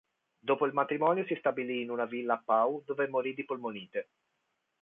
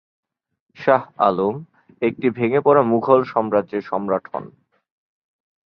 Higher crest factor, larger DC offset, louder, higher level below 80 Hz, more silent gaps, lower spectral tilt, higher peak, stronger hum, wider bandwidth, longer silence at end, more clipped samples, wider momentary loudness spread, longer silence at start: about the same, 18 dB vs 20 dB; neither; second, -32 LUFS vs -19 LUFS; second, -84 dBFS vs -64 dBFS; neither; about the same, -8.5 dB/octave vs -9.5 dB/octave; second, -14 dBFS vs -2 dBFS; neither; second, 3.8 kHz vs 5.8 kHz; second, 0.8 s vs 1.2 s; neither; about the same, 9 LU vs 9 LU; second, 0.45 s vs 0.8 s